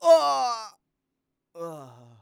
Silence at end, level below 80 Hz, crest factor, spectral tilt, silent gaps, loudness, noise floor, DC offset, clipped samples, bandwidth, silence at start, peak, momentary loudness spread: 0.35 s; -86 dBFS; 18 dB; -3 dB/octave; none; -23 LUFS; -82 dBFS; under 0.1%; under 0.1%; 15 kHz; 0 s; -8 dBFS; 24 LU